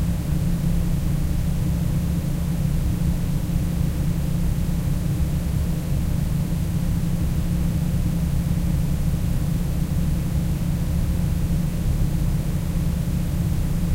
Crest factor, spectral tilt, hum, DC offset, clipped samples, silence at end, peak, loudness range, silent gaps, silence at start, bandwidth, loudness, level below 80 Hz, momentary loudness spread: 12 dB; -7 dB/octave; none; under 0.1%; under 0.1%; 0 s; -10 dBFS; 0 LU; none; 0 s; 16 kHz; -24 LUFS; -26 dBFS; 1 LU